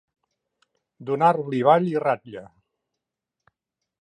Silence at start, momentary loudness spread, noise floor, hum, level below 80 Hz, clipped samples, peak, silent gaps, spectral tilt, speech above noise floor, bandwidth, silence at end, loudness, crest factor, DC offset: 1 s; 21 LU; -85 dBFS; none; -74 dBFS; under 0.1%; -4 dBFS; none; -8 dB/octave; 64 dB; 9.6 kHz; 1.6 s; -21 LUFS; 22 dB; under 0.1%